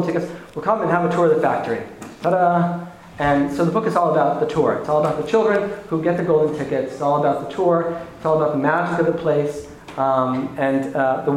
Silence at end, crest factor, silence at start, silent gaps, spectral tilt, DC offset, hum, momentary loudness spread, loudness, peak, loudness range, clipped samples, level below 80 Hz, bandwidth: 0 s; 16 dB; 0 s; none; -7.5 dB/octave; under 0.1%; none; 9 LU; -20 LUFS; -2 dBFS; 1 LU; under 0.1%; -52 dBFS; 12.5 kHz